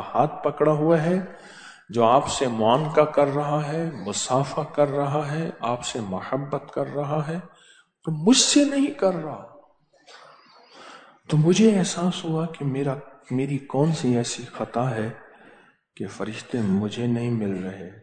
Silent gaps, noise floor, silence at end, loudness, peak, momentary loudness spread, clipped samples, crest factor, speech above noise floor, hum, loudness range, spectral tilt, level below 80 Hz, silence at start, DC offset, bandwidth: none; -57 dBFS; 0 s; -23 LUFS; -4 dBFS; 13 LU; under 0.1%; 20 dB; 34 dB; none; 6 LU; -5 dB/octave; -60 dBFS; 0 s; under 0.1%; 9.4 kHz